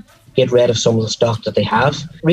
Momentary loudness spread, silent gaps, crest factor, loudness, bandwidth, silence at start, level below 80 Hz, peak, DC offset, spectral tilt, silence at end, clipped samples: 5 LU; none; 16 dB; -16 LUFS; 11.5 kHz; 0.35 s; -50 dBFS; 0 dBFS; under 0.1%; -5 dB/octave; 0 s; under 0.1%